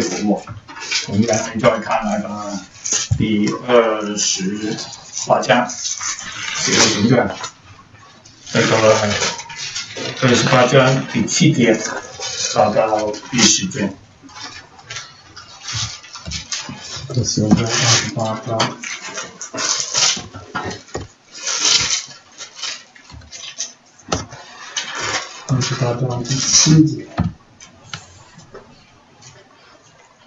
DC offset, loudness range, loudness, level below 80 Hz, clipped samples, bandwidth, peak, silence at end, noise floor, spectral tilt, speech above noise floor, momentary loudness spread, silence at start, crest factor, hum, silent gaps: under 0.1%; 8 LU; -17 LUFS; -46 dBFS; under 0.1%; 8.4 kHz; 0 dBFS; 0.95 s; -49 dBFS; -3.5 dB/octave; 32 dB; 19 LU; 0 s; 20 dB; none; none